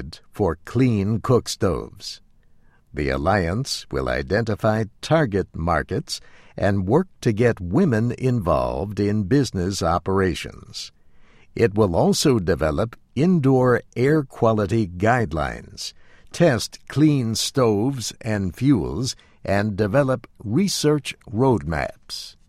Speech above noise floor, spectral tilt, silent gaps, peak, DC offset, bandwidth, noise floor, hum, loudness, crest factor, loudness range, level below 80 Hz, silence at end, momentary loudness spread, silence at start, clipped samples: 32 dB; -6 dB/octave; none; -4 dBFS; under 0.1%; 15.5 kHz; -53 dBFS; none; -21 LUFS; 18 dB; 4 LU; -42 dBFS; 0.2 s; 13 LU; 0 s; under 0.1%